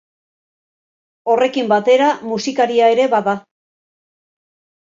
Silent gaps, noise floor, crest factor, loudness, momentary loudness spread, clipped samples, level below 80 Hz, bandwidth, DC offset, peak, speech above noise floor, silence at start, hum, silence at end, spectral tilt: none; under -90 dBFS; 16 dB; -15 LUFS; 8 LU; under 0.1%; -68 dBFS; 7.6 kHz; under 0.1%; -2 dBFS; over 75 dB; 1.25 s; none; 1.55 s; -4.5 dB/octave